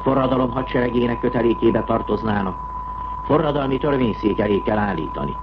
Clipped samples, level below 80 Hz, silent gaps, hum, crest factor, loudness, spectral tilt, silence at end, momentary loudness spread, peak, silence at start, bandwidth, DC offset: under 0.1%; -36 dBFS; none; none; 14 dB; -21 LUFS; -9.5 dB/octave; 0 s; 8 LU; -6 dBFS; 0 s; 5.8 kHz; under 0.1%